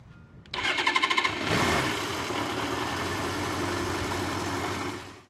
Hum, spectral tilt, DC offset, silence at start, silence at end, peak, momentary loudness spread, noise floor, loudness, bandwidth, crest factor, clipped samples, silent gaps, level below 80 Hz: none; -3.5 dB/octave; under 0.1%; 0 s; 0.1 s; -8 dBFS; 7 LU; -49 dBFS; -28 LUFS; 16.5 kHz; 22 dB; under 0.1%; none; -52 dBFS